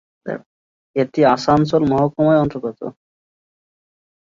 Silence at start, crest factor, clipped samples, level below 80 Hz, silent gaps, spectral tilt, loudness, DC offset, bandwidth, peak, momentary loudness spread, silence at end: 0.25 s; 18 dB; under 0.1%; -50 dBFS; 0.46-0.94 s; -7.5 dB/octave; -17 LUFS; under 0.1%; 7.6 kHz; -2 dBFS; 15 LU; 1.3 s